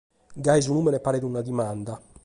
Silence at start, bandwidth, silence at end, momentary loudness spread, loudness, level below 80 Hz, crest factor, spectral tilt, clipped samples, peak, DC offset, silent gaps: 0.3 s; 11.5 kHz; 0.25 s; 11 LU; -25 LUFS; -56 dBFS; 18 dB; -6 dB/octave; under 0.1%; -8 dBFS; under 0.1%; none